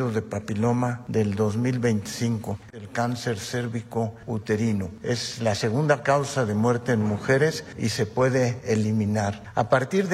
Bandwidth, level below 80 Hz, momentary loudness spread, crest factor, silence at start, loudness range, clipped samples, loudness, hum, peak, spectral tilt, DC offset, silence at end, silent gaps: 14.5 kHz; -58 dBFS; 7 LU; 18 dB; 0 s; 4 LU; under 0.1%; -25 LUFS; none; -6 dBFS; -6 dB/octave; under 0.1%; 0 s; none